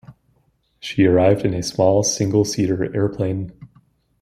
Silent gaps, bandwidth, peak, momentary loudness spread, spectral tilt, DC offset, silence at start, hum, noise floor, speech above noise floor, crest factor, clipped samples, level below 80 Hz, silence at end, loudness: none; 15 kHz; -2 dBFS; 12 LU; -5.5 dB/octave; under 0.1%; 0.1 s; none; -63 dBFS; 45 dB; 16 dB; under 0.1%; -50 dBFS; 0.55 s; -19 LUFS